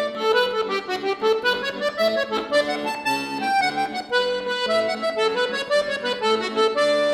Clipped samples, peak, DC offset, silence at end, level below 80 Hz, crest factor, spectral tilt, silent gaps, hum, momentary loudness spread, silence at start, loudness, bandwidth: under 0.1%; -8 dBFS; under 0.1%; 0 s; -62 dBFS; 16 dB; -3 dB/octave; none; none; 4 LU; 0 s; -22 LUFS; 17 kHz